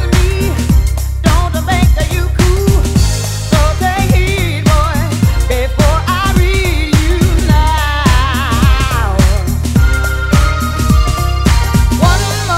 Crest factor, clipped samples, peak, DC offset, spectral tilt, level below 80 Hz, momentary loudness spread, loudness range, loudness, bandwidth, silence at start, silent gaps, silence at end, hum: 10 dB; 0.3%; 0 dBFS; under 0.1%; -5.5 dB/octave; -14 dBFS; 3 LU; 1 LU; -12 LUFS; 16 kHz; 0 s; none; 0 s; none